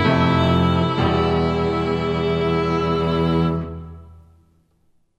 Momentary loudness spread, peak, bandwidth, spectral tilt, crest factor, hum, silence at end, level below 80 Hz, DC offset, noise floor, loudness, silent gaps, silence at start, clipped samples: 7 LU; -4 dBFS; 8.2 kHz; -8 dB/octave; 16 dB; none; 1.05 s; -38 dBFS; under 0.1%; -61 dBFS; -19 LUFS; none; 0 s; under 0.1%